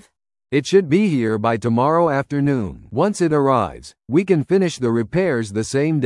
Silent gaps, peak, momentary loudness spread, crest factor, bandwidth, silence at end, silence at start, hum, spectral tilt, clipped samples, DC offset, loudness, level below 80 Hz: none; -2 dBFS; 6 LU; 16 dB; 11.5 kHz; 0 s; 0.5 s; none; -6.5 dB/octave; under 0.1%; under 0.1%; -19 LUFS; -52 dBFS